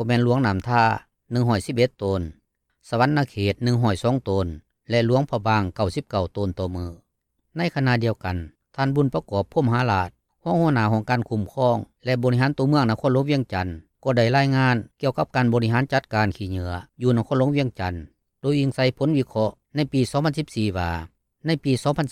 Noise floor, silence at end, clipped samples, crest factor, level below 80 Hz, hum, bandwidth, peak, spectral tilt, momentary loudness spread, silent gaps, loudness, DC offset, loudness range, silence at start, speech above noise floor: -74 dBFS; 0 s; under 0.1%; 16 dB; -52 dBFS; none; 13 kHz; -6 dBFS; -7 dB/octave; 10 LU; none; -23 LUFS; under 0.1%; 3 LU; 0 s; 52 dB